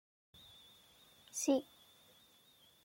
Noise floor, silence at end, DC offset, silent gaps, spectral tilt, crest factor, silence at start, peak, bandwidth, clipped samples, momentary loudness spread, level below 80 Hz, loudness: -67 dBFS; 1.2 s; under 0.1%; none; -2.5 dB/octave; 22 dB; 1.35 s; -22 dBFS; 16.5 kHz; under 0.1%; 27 LU; -84 dBFS; -37 LUFS